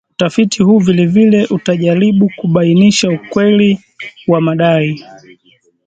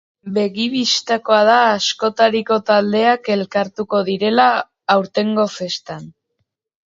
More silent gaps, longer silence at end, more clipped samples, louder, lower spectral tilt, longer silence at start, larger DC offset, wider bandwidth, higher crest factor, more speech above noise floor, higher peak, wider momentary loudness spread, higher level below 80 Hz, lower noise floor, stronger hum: neither; about the same, 0.85 s vs 0.75 s; neither; first, -11 LUFS vs -16 LUFS; first, -6 dB/octave vs -4 dB/octave; about the same, 0.2 s vs 0.25 s; neither; first, 9 kHz vs 7.8 kHz; second, 12 dB vs 18 dB; second, 42 dB vs 56 dB; about the same, 0 dBFS vs 0 dBFS; about the same, 7 LU vs 8 LU; first, -52 dBFS vs -64 dBFS; second, -52 dBFS vs -72 dBFS; neither